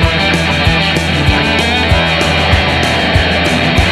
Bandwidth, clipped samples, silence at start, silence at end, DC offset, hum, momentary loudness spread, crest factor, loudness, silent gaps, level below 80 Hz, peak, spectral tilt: 14 kHz; under 0.1%; 0 s; 0 s; under 0.1%; none; 1 LU; 10 dB; -11 LUFS; none; -20 dBFS; 0 dBFS; -5 dB/octave